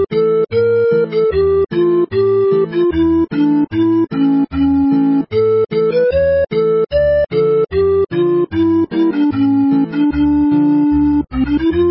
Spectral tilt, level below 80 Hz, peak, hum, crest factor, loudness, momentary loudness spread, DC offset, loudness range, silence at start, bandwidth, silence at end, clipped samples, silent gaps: -13 dB/octave; -34 dBFS; -4 dBFS; none; 8 dB; -14 LUFS; 2 LU; under 0.1%; 0 LU; 0 s; 5.8 kHz; 0 s; under 0.1%; none